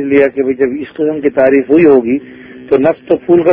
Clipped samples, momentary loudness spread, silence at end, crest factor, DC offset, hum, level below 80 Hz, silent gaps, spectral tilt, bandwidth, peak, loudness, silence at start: 0.2%; 9 LU; 0 s; 10 dB; under 0.1%; none; -48 dBFS; none; -10 dB/octave; 3.7 kHz; 0 dBFS; -11 LUFS; 0 s